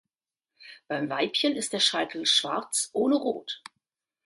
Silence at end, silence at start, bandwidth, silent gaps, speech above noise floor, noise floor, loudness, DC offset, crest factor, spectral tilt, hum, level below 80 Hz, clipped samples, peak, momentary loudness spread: 0.7 s; 0.6 s; 12 kHz; none; 62 dB; -90 dBFS; -26 LUFS; under 0.1%; 18 dB; -2 dB/octave; none; -78 dBFS; under 0.1%; -10 dBFS; 12 LU